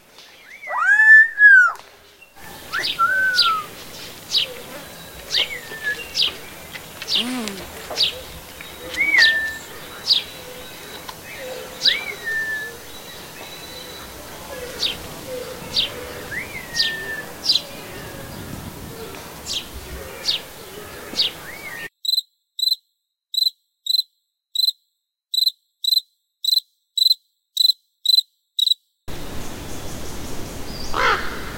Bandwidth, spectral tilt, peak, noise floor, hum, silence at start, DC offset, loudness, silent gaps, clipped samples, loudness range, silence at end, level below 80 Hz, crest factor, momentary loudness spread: 16.5 kHz; -1 dB/octave; -2 dBFS; -74 dBFS; none; 0.2 s; under 0.1%; -18 LUFS; none; under 0.1%; 9 LU; 0 s; -46 dBFS; 20 dB; 19 LU